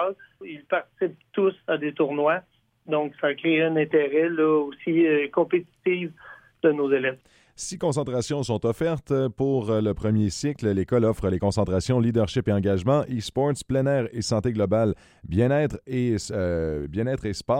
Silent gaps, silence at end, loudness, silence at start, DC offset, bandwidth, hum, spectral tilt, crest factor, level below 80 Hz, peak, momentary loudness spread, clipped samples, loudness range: none; 0 s; -24 LUFS; 0 s; under 0.1%; 13.5 kHz; none; -6.5 dB/octave; 16 dB; -48 dBFS; -8 dBFS; 7 LU; under 0.1%; 3 LU